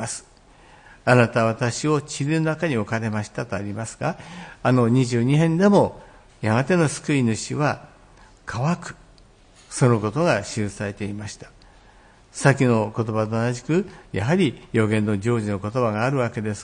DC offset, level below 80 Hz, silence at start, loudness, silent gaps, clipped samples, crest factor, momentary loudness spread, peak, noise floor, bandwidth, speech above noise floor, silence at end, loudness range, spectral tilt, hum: under 0.1%; -54 dBFS; 0 s; -22 LUFS; none; under 0.1%; 20 dB; 13 LU; -2 dBFS; -51 dBFS; 10.5 kHz; 30 dB; 0 s; 5 LU; -6 dB/octave; none